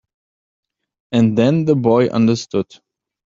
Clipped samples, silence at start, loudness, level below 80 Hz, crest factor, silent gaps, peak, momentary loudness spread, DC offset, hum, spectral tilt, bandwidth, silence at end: under 0.1%; 1.1 s; -16 LUFS; -56 dBFS; 16 dB; none; -2 dBFS; 9 LU; under 0.1%; none; -7.5 dB/octave; 7.6 kHz; 0.65 s